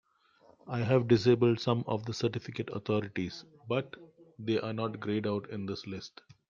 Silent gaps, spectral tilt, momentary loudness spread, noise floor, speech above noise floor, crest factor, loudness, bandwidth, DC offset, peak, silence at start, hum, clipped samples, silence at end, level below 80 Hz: none; -7 dB/octave; 16 LU; -64 dBFS; 33 dB; 20 dB; -32 LUFS; 7.4 kHz; under 0.1%; -12 dBFS; 0.65 s; none; under 0.1%; 0.4 s; -68 dBFS